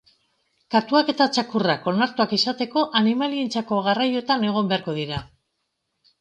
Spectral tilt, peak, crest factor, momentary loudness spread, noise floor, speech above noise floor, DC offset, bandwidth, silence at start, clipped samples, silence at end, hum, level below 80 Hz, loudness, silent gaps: -5 dB/octave; -4 dBFS; 18 dB; 5 LU; -76 dBFS; 54 dB; under 0.1%; 9.2 kHz; 0.7 s; under 0.1%; 0.95 s; none; -58 dBFS; -22 LUFS; none